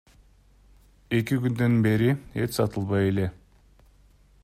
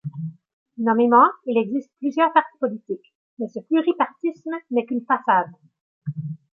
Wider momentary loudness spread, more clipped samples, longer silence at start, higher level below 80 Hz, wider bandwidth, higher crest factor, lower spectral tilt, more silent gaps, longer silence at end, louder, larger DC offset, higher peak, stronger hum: second, 7 LU vs 17 LU; neither; first, 1.1 s vs 0.05 s; first, -54 dBFS vs -78 dBFS; first, 15.5 kHz vs 6.4 kHz; about the same, 16 dB vs 20 dB; second, -7 dB/octave vs -8.5 dB/octave; second, none vs 0.53-0.66 s, 3.15-3.37 s, 5.81-6.01 s; first, 1.1 s vs 0.2 s; second, -25 LUFS vs -21 LUFS; neither; second, -10 dBFS vs -4 dBFS; neither